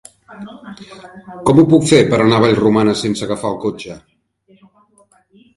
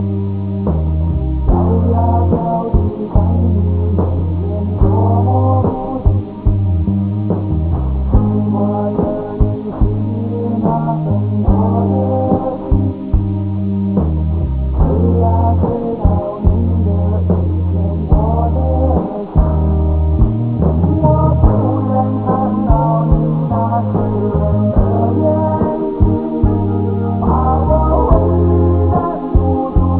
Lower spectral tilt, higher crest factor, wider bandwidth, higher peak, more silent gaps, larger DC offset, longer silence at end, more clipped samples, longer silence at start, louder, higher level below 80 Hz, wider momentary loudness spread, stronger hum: second, -6 dB/octave vs -14 dB/octave; about the same, 16 dB vs 14 dB; first, 11.5 kHz vs 4 kHz; about the same, 0 dBFS vs 0 dBFS; neither; second, under 0.1% vs 0.4%; first, 1.6 s vs 0 s; neither; first, 0.3 s vs 0 s; about the same, -13 LUFS vs -15 LUFS; second, -48 dBFS vs -18 dBFS; first, 25 LU vs 5 LU; neither